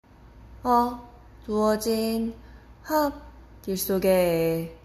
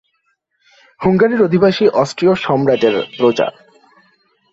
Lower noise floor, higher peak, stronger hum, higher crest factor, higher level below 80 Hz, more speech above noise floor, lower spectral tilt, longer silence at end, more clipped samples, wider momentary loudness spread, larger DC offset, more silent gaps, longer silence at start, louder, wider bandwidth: second, -49 dBFS vs -65 dBFS; second, -10 dBFS vs -2 dBFS; neither; about the same, 16 dB vs 14 dB; about the same, -48 dBFS vs -52 dBFS; second, 25 dB vs 52 dB; about the same, -5.5 dB/octave vs -6.5 dB/octave; second, 0.1 s vs 1.05 s; neither; first, 20 LU vs 5 LU; neither; neither; second, 0.35 s vs 1 s; second, -25 LUFS vs -14 LUFS; first, 16 kHz vs 8 kHz